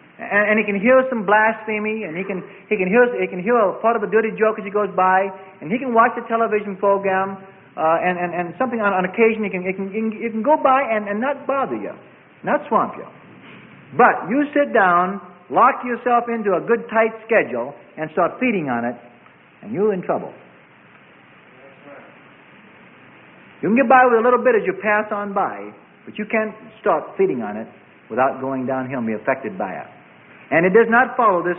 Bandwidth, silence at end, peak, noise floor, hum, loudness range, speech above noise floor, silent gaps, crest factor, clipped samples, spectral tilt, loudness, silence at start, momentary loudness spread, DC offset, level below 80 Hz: 3.8 kHz; 0 s; -2 dBFS; -49 dBFS; none; 6 LU; 30 dB; none; 18 dB; under 0.1%; -11 dB/octave; -19 LUFS; 0.2 s; 13 LU; under 0.1%; -66 dBFS